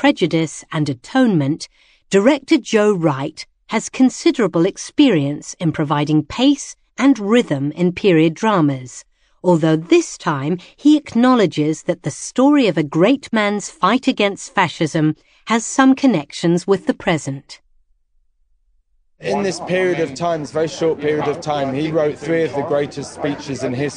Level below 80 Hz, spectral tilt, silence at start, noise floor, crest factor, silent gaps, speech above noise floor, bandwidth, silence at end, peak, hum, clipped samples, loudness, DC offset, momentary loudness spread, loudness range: -54 dBFS; -5.5 dB/octave; 0 s; -60 dBFS; 16 dB; none; 43 dB; 10.5 kHz; 0 s; 0 dBFS; none; under 0.1%; -17 LUFS; under 0.1%; 9 LU; 5 LU